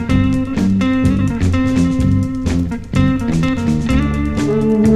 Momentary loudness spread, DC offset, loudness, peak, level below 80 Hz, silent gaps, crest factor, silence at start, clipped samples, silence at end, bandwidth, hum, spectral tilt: 3 LU; under 0.1%; -16 LUFS; -2 dBFS; -26 dBFS; none; 12 dB; 0 s; under 0.1%; 0 s; 12.5 kHz; none; -7.5 dB/octave